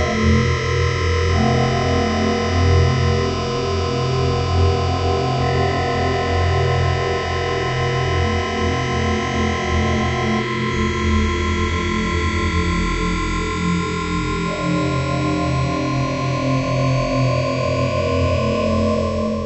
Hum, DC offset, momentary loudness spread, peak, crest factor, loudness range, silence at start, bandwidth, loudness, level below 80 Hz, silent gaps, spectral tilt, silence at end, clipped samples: none; under 0.1%; 4 LU; -4 dBFS; 14 dB; 2 LU; 0 s; 8.4 kHz; -19 LUFS; -30 dBFS; none; -6 dB/octave; 0 s; under 0.1%